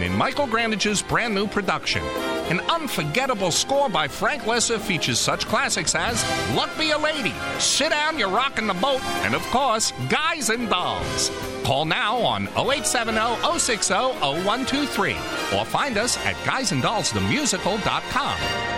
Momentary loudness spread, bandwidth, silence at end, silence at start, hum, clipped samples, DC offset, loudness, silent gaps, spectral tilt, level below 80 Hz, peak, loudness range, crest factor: 3 LU; 16.5 kHz; 0 s; 0 s; none; under 0.1%; under 0.1%; -22 LUFS; none; -2.5 dB/octave; -46 dBFS; -4 dBFS; 1 LU; 18 dB